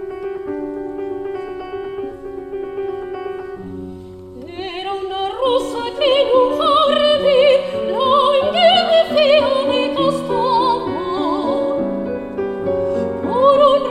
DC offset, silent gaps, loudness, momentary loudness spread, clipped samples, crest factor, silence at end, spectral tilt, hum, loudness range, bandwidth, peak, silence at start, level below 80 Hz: under 0.1%; none; -17 LUFS; 16 LU; under 0.1%; 16 dB; 0 s; -5 dB/octave; none; 14 LU; 11.5 kHz; -2 dBFS; 0 s; -48 dBFS